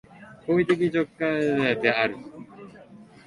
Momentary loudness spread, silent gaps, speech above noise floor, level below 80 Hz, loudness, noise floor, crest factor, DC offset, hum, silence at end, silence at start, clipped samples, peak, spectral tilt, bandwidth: 20 LU; none; 25 dB; -62 dBFS; -24 LUFS; -48 dBFS; 22 dB; under 0.1%; none; 0.25 s; 0.2 s; under 0.1%; -4 dBFS; -6.5 dB/octave; 11 kHz